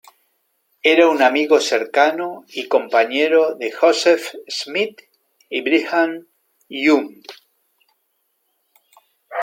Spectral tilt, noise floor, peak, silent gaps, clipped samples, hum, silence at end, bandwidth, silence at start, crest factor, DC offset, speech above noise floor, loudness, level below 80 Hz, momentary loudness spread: -2.5 dB/octave; -69 dBFS; -2 dBFS; none; under 0.1%; none; 0 s; 16.5 kHz; 0.85 s; 18 dB; under 0.1%; 52 dB; -17 LUFS; -76 dBFS; 13 LU